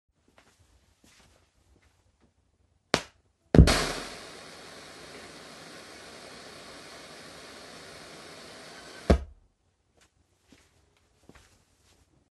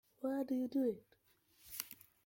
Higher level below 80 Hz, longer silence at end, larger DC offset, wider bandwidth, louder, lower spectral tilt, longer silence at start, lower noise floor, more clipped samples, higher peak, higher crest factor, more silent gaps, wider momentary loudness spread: first, -38 dBFS vs -80 dBFS; first, 3.15 s vs 0.3 s; neither; second, 12 kHz vs 17 kHz; first, -26 LUFS vs -41 LUFS; about the same, -5.5 dB/octave vs -4.5 dB/octave; first, 2.95 s vs 0.2 s; about the same, -71 dBFS vs -68 dBFS; neither; first, 0 dBFS vs -18 dBFS; first, 32 dB vs 24 dB; neither; first, 23 LU vs 12 LU